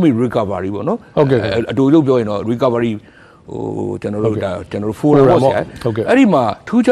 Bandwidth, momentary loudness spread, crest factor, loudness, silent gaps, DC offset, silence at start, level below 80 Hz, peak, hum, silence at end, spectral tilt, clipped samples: 12 kHz; 11 LU; 14 dB; -15 LUFS; none; under 0.1%; 0 s; -46 dBFS; 0 dBFS; none; 0 s; -8 dB/octave; under 0.1%